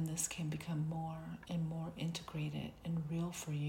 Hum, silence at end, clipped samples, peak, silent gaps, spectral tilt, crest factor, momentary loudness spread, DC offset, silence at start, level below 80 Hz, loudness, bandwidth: none; 0 s; under 0.1%; -24 dBFS; none; -5 dB/octave; 16 dB; 5 LU; under 0.1%; 0 s; -64 dBFS; -41 LUFS; 16.5 kHz